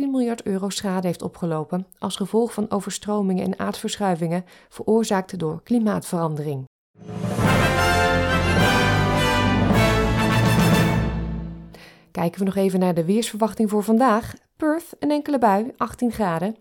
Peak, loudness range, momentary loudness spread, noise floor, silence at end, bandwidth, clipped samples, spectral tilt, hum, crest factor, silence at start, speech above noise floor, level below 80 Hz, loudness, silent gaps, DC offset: -6 dBFS; 6 LU; 10 LU; -45 dBFS; 0.05 s; 18 kHz; under 0.1%; -5.5 dB/octave; none; 16 dB; 0 s; 23 dB; -38 dBFS; -22 LUFS; 6.67-6.94 s; under 0.1%